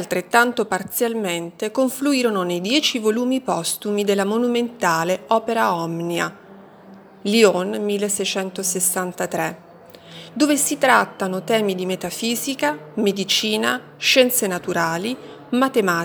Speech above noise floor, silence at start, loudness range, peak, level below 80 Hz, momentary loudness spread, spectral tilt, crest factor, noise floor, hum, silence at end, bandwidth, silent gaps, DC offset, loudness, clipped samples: 24 dB; 0 s; 2 LU; 0 dBFS; -68 dBFS; 9 LU; -3 dB/octave; 20 dB; -44 dBFS; none; 0 s; over 20 kHz; none; under 0.1%; -20 LUFS; under 0.1%